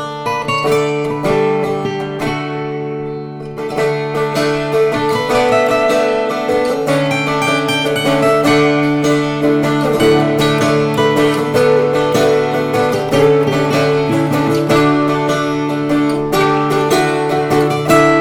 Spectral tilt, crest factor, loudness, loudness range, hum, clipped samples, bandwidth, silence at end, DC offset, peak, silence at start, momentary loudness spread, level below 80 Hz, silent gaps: -5.5 dB/octave; 14 dB; -14 LUFS; 5 LU; none; under 0.1%; 17 kHz; 0 s; under 0.1%; 0 dBFS; 0 s; 7 LU; -44 dBFS; none